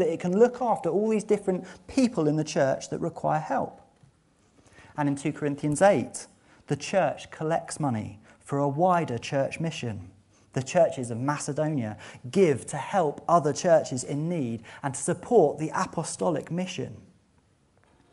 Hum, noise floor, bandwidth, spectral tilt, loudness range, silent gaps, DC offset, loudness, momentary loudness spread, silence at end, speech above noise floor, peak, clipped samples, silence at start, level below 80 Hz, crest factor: none; -64 dBFS; 11.5 kHz; -6 dB/octave; 3 LU; none; under 0.1%; -27 LUFS; 12 LU; 1.15 s; 38 dB; -8 dBFS; under 0.1%; 0 s; -64 dBFS; 20 dB